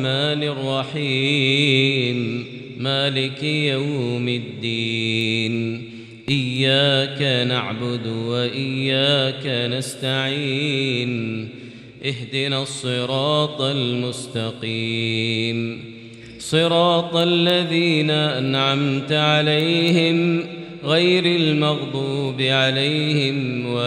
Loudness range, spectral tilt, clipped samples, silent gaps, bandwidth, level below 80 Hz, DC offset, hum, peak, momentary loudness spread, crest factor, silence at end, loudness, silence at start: 5 LU; -5.5 dB/octave; under 0.1%; none; 12.5 kHz; -64 dBFS; under 0.1%; none; -4 dBFS; 10 LU; 16 dB; 0 s; -20 LUFS; 0 s